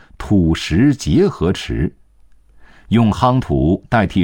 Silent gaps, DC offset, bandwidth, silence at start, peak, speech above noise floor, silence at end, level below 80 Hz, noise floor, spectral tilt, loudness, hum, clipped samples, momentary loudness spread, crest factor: none; 0.2%; 17 kHz; 0.2 s; -2 dBFS; 33 dB; 0 s; -32 dBFS; -47 dBFS; -7 dB/octave; -16 LUFS; none; under 0.1%; 6 LU; 16 dB